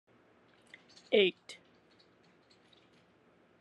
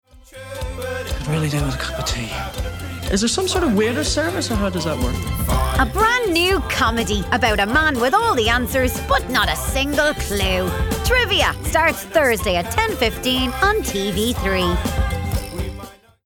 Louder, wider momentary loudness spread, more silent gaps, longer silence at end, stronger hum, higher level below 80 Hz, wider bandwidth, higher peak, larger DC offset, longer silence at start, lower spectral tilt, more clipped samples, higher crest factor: second, -30 LUFS vs -19 LUFS; first, 28 LU vs 10 LU; neither; first, 2.1 s vs 0.3 s; neither; second, -88 dBFS vs -28 dBFS; second, 10 kHz vs 19.5 kHz; second, -12 dBFS vs -6 dBFS; neither; first, 1.1 s vs 0.15 s; about the same, -4.5 dB/octave vs -4 dB/octave; neither; first, 26 dB vs 14 dB